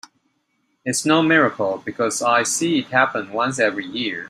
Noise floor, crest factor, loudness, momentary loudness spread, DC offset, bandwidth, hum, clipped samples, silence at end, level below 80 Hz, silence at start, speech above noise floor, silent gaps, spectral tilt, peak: -69 dBFS; 18 dB; -19 LUFS; 8 LU; under 0.1%; 15.5 kHz; none; under 0.1%; 0 s; -66 dBFS; 0.85 s; 49 dB; none; -3.5 dB/octave; -2 dBFS